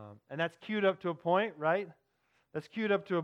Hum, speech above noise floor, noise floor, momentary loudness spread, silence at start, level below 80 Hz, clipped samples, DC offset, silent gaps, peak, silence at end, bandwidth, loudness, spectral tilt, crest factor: none; 43 dB; -75 dBFS; 13 LU; 0 s; -84 dBFS; under 0.1%; under 0.1%; none; -16 dBFS; 0 s; 9.6 kHz; -33 LUFS; -7.5 dB/octave; 18 dB